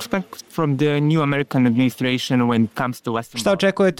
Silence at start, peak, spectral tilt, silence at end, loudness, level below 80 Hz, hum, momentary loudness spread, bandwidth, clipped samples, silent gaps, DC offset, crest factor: 0 s; -8 dBFS; -6 dB/octave; 0.05 s; -20 LUFS; -56 dBFS; none; 8 LU; 17 kHz; under 0.1%; none; 0.1%; 12 dB